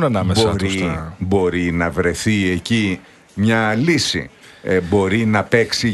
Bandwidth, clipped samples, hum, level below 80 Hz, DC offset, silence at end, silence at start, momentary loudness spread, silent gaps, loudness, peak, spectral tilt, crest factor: 12 kHz; under 0.1%; none; -40 dBFS; under 0.1%; 0 s; 0 s; 8 LU; none; -18 LUFS; 0 dBFS; -5 dB/octave; 18 dB